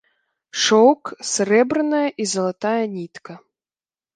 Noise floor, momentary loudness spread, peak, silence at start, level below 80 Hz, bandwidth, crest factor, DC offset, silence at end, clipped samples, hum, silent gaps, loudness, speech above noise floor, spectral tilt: under -90 dBFS; 16 LU; -2 dBFS; 0.55 s; -70 dBFS; 10 kHz; 18 dB; under 0.1%; 0.8 s; under 0.1%; none; none; -19 LUFS; over 71 dB; -3.5 dB/octave